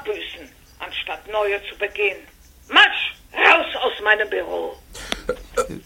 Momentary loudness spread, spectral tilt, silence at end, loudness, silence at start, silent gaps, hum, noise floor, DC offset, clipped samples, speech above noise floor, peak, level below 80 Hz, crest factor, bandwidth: 18 LU; -2 dB/octave; 0.05 s; -19 LUFS; 0 s; none; none; -41 dBFS; under 0.1%; under 0.1%; 21 dB; 0 dBFS; -48 dBFS; 22 dB; 17 kHz